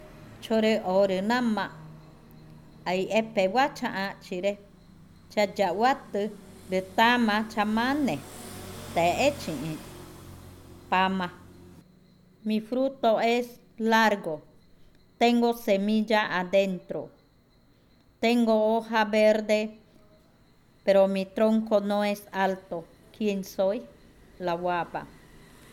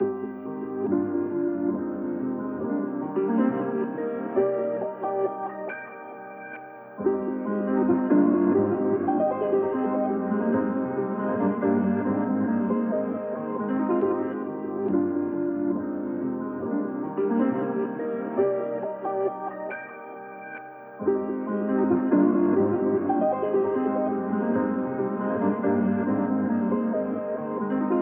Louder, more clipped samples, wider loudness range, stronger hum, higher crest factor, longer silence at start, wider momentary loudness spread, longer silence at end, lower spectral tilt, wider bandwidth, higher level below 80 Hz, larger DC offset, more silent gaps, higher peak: about the same, -26 LUFS vs -26 LUFS; neither; about the same, 4 LU vs 6 LU; neither; about the same, 18 dB vs 16 dB; about the same, 0 s vs 0 s; first, 15 LU vs 10 LU; first, 0.6 s vs 0 s; second, -5 dB/octave vs -13 dB/octave; first, 17 kHz vs 3.3 kHz; first, -60 dBFS vs -70 dBFS; neither; neither; about the same, -8 dBFS vs -8 dBFS